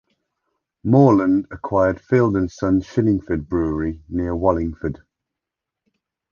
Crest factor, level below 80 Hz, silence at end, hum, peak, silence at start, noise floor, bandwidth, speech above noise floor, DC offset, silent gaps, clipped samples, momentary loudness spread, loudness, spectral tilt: 20 dB; -40 dBFS; 1.4 s; none; -2 dBFS; 0.85 s; -85 dBFS; 7 kHz; 66 dB; under 0.1%; none; under 0.1%; 12 LU; -19 LUFS; -9.5 dB/octave